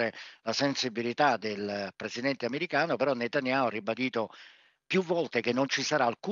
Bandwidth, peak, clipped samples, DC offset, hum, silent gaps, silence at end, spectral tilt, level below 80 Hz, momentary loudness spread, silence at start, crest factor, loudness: 7.6 kHz; -12 dBFS; under 0.1%; under 0.1%; none; none; 0 s; -4 dB/octave; -84 dBFS; 7 LU; 0 s; 18 dB; -30 LUFS